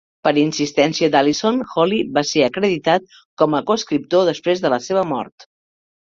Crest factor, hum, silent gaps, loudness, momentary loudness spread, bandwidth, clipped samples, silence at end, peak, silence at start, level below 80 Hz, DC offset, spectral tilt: 16 dB; none; 3.25-3.37 s; -18 LUFS; 4 LU; 7.6 kHz; under 0.1%; 0.75 s; -2 dBFS; 0.25 s; -60 dBFS; under 0.1%; -4.5 dB/octave